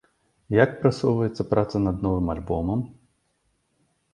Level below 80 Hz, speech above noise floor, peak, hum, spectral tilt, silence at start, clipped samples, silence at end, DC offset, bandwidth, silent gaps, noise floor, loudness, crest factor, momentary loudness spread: -42 dBFS; 48 dB; -4 dBFS; none; -8 dB/octave; 0.5 s; under 0.1%; 1.2 s; under 0.1%; 11 kHz; none; -71 dBFS; -24 LUFS; 22 dB; 6 LU